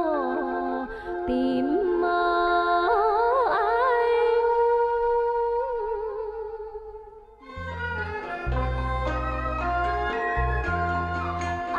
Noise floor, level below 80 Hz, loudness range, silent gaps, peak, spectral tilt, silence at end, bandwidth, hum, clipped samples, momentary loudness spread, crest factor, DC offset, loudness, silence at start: -46 dBFS; -38 dBFS; 9 LU; none; -12 dBFS; -7.5 dB/octave; 0 s; 7.6 kHz; none; under 0.1%; 11 LU; 14 dB; under 0.1%; -25 LUFS; 0 s